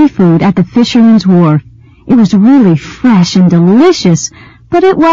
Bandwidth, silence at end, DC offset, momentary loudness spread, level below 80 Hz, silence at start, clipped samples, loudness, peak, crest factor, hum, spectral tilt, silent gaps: 7.6 kHz; 0 s; 0.7%; 5 LU; -42 dBFS; 0 s; 0.4%; -7 LUFS; 0 dBFS; 6 dB; none; -6.5 dB/octave; none